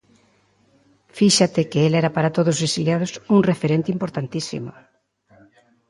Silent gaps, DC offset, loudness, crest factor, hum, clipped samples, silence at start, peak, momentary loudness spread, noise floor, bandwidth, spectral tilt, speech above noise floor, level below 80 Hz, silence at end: none; under 0.1%; -20 LUFS; 18 dB; none; under 0.1%; 1.15 s; -2 dBFS; 11 LU; -60 dBFS; 11.5 kHz; -5 dB/octave; 41 dB; -60 dBFS; 1.2 s